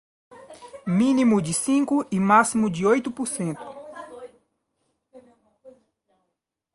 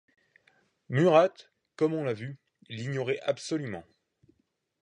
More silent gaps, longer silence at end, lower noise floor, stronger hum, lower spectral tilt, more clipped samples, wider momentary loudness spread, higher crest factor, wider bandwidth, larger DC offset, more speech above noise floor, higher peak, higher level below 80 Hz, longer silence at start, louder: neither; about the same, 1.05 s vs 1 s; first, -80 dBFS vs -76 dBFS; neither; about the same, -5.5 dB/octave vs -6.5 dB/octave; neither; first, 22 LU vs 18 LU; about the same, 20 dB vs 22 dB; first, 11.5 kHz vs 10 kHz; neither; first, 59 dB vs 48 dB; first, -4 dBFS vs -8 dBFS; first, -62 dBFS vs -72 dBFS; second, 0.4 s vs 0.9 s; first, -22 LUFS vs -28 LUFS